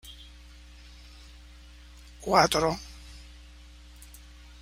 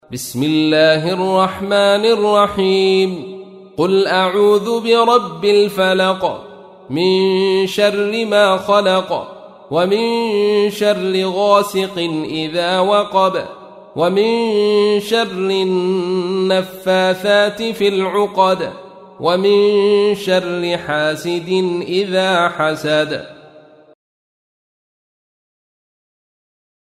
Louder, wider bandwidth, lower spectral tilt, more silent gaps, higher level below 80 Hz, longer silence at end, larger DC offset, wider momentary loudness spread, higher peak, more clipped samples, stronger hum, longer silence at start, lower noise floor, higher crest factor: second, -25 LUFS vs -15 LUFS; about the same, 16 kHz vs 15 kHz; second, -3.5 dB/octave vs -5 dB/octave; neither; first, -48 dBFS vs -58 dBFS; second, 1.4 s vs 3.6 s; neither; first, 28 LU vs 8 LU; second, -6 dBFS vs -2 dBFS; neither; first, 60 Hz at -50 dBFS vs none; about the same, 0.05 s vs 0.1 s; first, -49 dBFS vs -43 dBFS; first, 26 dB vs 14 dB